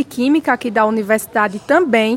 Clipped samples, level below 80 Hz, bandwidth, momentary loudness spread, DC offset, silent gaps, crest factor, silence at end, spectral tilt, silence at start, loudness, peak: under 0.1%; -58 dBFS; 16.5 kHz; 4 LU; under 0.1%; none; 14 dB; 0 s; -4.5 dB/octave; 0 s; -16 LUFS; -2 dBFS